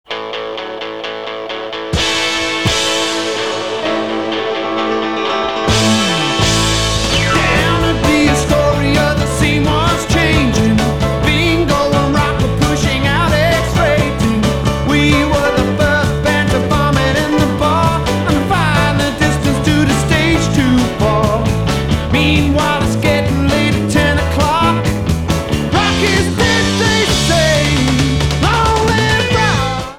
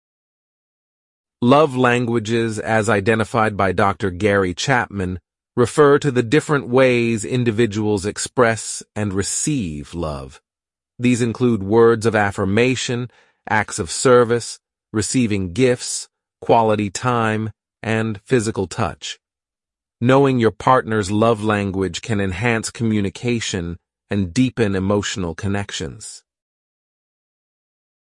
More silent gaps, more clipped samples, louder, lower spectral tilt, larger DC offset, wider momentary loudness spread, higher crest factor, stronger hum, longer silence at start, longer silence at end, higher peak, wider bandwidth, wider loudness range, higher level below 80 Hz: neither; neither; first, -13 LUFS vs -19 LUFS; about the same, -5 dB/octave vs -5 dB/octave; first, 1% vs under 0.1%; second, 5 LU vs 12 LU; second, 12 dB vs 18 dB; neither; second, 0.1 s vs 1.4 s; second, 0 s vs 1.9 s; about the same, -2 dBFS vs -2 dBFS; first, 17.5 kHz vs 11.5 kHz; about the same, 3 LU vs 5 LU; first, -24 dBFS vs -50 dBFS